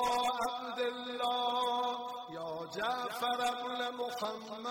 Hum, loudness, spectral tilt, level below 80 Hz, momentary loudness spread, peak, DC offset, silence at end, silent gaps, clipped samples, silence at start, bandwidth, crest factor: none; -36 LUFS; -2.5 dB/octave; -74 dBFS; 9 LU; -22 dBFS; under 0.1%; 0 s; none; under 0.1%; 0 s; 16.5 kHz; 14 dB